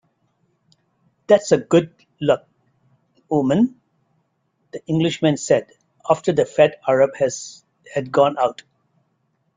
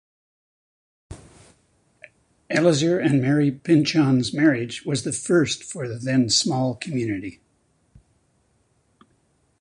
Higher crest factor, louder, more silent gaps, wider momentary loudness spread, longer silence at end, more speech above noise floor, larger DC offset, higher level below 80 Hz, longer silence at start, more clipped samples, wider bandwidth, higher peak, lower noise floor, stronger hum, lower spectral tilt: about the same, 20 dB vs 18 dB; about the same, -19 LUFS vs -21 LUFS; neither; about the same, 12 LU vs 10 LU; second, 1.05 s vs 2.3 s; first, 50 dB vs 45 dB; neither; about the same, -60 dBFS vs -56 dBFS; first, 1.3 s vs 1.1 s; neither; second, 9.6 kHz vs 11 kHz; about the same, -2 dBFS vs -4 dBFS; about the same, -68 dBFS vs -65 dBFS; neither; about the same, -5.5 dB/octave vs -5 dB/octave